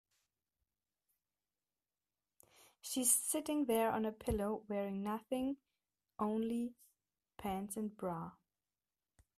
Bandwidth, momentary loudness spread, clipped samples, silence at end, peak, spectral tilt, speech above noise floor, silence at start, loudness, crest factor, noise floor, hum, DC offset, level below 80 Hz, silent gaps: 15.5 kHz; 15 LU; under 0.1%; 1.05 s; -16 dBFS; -4 dB/octave; over 52 dB; 2.85 s; -38 LUFS; 24 dB; under -90 dBFS; 50 Hz at -70 dBFS; under 0.1%; -62 dBFS; none